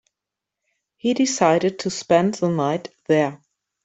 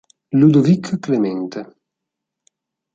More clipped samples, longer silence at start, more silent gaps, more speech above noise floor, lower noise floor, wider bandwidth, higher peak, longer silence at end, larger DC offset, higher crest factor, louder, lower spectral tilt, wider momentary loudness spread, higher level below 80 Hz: neither; first, 1.05 s vs 0.3 s; neither; about the same, 65 dB vs 66 dB; first, -85 dBFS vs -81 dBFS; about the same, 8.4 kHz vs 7.8 kHz; about the same, -2 dBFS vs -2 dBFS; second, 0.5 s vs 1.3 s; neither; about the same, 20 dB vs 16 dB; second, -21 LUFS vs -16 LUFS; second, -5 dB/octave vs -8.5 dB/octave; second, 9 LU vs 15 LU; about the same, -64 dBFS vs -64 dBFS